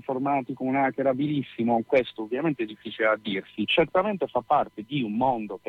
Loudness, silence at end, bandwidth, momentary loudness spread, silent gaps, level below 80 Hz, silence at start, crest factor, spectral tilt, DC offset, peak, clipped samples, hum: -26 LUFS; 0.1 s; 6 kHz; 7 LU; none; -62 dBFS; 0.1 s; 16 dB; -8 dB/octave; under 0.1%; -10 dBFS; under 0.1%; none